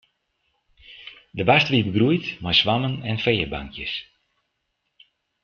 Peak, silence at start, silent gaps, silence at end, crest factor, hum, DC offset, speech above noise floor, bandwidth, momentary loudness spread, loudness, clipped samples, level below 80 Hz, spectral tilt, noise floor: -4 dBFS; 0.9 s; none; 1.4 s; 20 dB; none; under 0.1%; 54 dB; 6.8 kHz; 18 LU; -21 LUFS; under 0.1%; -50 dBFS; -6.5 dB/octave; -76 dBFS